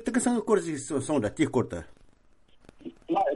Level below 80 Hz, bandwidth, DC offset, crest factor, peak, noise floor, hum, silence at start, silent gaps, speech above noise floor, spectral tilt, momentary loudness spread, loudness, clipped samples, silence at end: -58 dBFS; 11.5 kHz; under 0.1%; 18 dB; -10 dBFS; -58 dBFS; none; 0 s; none; 31 dB; -5.5 dB/octave; 19 LU; -28 LUFS; under 0.1%; 0 s